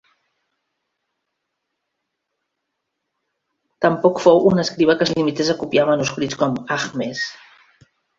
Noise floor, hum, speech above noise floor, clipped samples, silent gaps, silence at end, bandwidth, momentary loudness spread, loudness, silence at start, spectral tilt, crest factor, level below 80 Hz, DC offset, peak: -78 dBFS; none; 60 dB; under 0.1%; none; 0.85 s; 7.8 kHz; 10 LU; -18 LUFS; 3.8 s; -5 dB/octave; 20 dB; -58 dBFS; under 0.1%; -2 dBFS